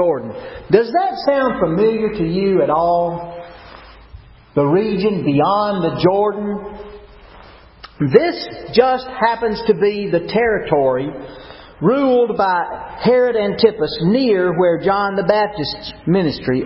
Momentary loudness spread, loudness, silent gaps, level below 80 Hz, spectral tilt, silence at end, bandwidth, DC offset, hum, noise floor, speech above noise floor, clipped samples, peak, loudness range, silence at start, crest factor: 12 LU; -17 LUFS; none; -46 dBFS; -10.5 dB/octave; 0 s; 5.8 kHz; under 0.1%; none; -42 dBFS; 26 dB; under 0.1%; 0 dBFS; 3 LU; 0 s; 16 dB